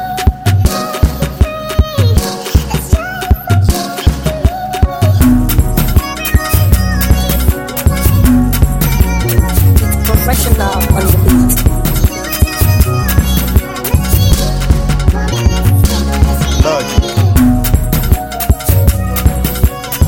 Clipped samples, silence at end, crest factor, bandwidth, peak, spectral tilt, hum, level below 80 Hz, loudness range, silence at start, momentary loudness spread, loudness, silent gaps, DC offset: 0.5%; 0 s; 10 dB; 17.5 kHz; 0 dBFS; -5.5 dB/octave; none; -14 dBFS; 3 LU; 0 s; 5 LU; -12 LUFS; none; under 0.1%